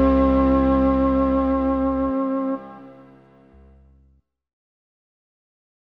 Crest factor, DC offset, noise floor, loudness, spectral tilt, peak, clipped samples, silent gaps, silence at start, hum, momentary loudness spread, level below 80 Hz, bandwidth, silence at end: 14 dB; under 0.1%; -60 dBFS; -20 LUFS; -10.5 dB/octave; -8 dBFS; under 0.1%; none; 0 s; none; 9 LU; -34 dBFS; 4.7 kHz; 3.05 s